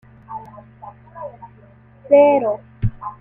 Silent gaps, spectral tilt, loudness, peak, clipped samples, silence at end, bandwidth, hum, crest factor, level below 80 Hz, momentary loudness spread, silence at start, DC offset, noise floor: none; -10.5 dB/octave; -16 LUFS; -2 dBFS; under 0.1%; 0.1 s; 3.3 kHz; none; 18 dB; -40 dBFS; 23 LU; 0.3 s; under 0.1%; -47 dBFS